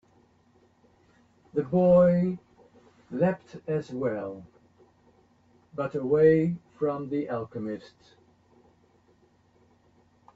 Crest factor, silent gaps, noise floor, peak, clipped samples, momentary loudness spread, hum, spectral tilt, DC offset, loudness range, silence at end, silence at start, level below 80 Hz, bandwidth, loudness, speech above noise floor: 20 dB; none; -63 dBFS; -10 dBFS; under 0.1%; 19 LU; none; -10 dB/octave; under 0.1%; 9 LU; 2.5 s; 1.55 s; -64 dBFS; 7.2 kHz; -26 LUFS; 38 dB